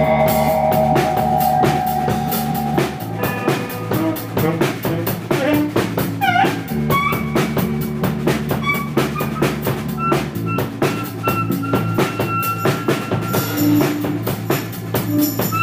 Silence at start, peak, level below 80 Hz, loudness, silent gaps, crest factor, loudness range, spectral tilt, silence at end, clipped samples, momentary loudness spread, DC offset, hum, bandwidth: 0 s; -4 dBFS; -42 dBFS; -19 LUFS; none; 14 dB; 2 LU; -6 dB/octave; 0 s; under 0.1%; 6 LU; under 0.1%; none; 16 kHz